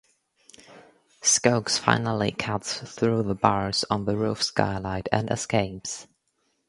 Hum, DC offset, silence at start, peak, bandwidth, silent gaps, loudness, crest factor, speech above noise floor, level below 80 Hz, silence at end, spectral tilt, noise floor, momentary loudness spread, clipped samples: none; under 0.1%; 0.7 s; 0 dBFS; 11.5 kHz; none; -25 LUFS; 26 dB; 48 dB; -52 dBFS; 0.65 s; -3.5 dB/octave; -73 dBFS; 9 LU; under 0.1%